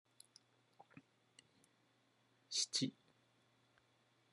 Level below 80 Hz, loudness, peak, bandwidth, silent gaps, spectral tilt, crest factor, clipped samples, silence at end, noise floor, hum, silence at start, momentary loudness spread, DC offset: under -90 dBFS; -40 LUFS; -26 dBFS; 11.5 kHz; none; -2 dB/octave; 24 dB; under 0.1%; 1.4 s; -77 dBFS; none; 0.95 s; 27 LU; under 0.1%